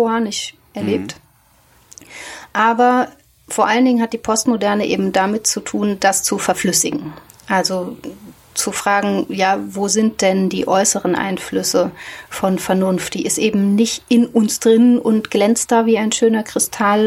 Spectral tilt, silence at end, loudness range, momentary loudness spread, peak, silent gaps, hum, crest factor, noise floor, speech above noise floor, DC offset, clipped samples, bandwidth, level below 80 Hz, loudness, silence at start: -4 dB/octave; 0 s; 4 LU; 11 LU; -2 dBFS; none; none; 16 dB; -53 dBFS; 37 dB; under 0.1%; under 0.1%; 16.5 kHz; -54 dBFS; -16 LUFS; 0 s